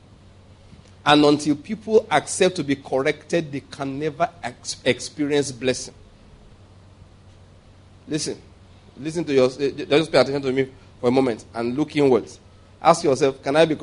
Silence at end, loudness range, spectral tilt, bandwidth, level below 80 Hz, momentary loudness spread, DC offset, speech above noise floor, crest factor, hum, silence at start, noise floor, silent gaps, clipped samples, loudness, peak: 0 s; 9 LU; -4.5 dB/octave; 11 kHz; -54 dBFS; 12 LU; under 0.1%; 28 dB; 22 dB; none; 1.05 s; -49 dBFS; none; under 0.1%; -21 LUFS; 0 dBFS